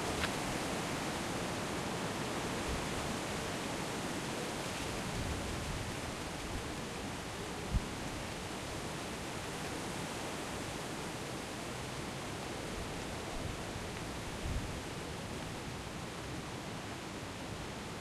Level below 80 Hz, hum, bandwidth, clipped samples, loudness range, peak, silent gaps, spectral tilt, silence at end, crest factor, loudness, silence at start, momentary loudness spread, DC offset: -50 dBFS; none; 16 kHz; under 0.1%; 4 LU; -20 dBFS; none; -4 dB/octave; 0 s; 20 dB; -40 LUFS; 0 s; 5 LU; under 0.1%